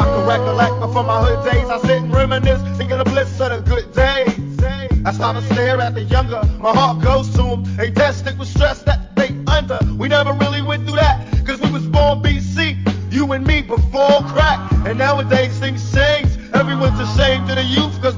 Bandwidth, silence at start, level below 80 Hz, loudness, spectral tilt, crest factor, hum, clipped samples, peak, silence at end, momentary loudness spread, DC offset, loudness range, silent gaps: 7.6 kHz; 0 s; -22 dBFS; -16 LUFS; -6.5 dB/octave; 14 dB; none; under 0.1%; -2 dBFS; 0 s; 5 LU; 0.2%; 2 LU; none